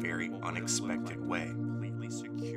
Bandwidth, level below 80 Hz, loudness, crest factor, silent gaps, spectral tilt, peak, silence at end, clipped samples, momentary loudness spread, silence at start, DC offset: 16 kHz; -70 dBFS; -36 LUFS; 16 dB; none; -4.5 dB/octave; -20 dBFS; 0 s; under 0.1%; 6 LU; 0 s; under 0.1%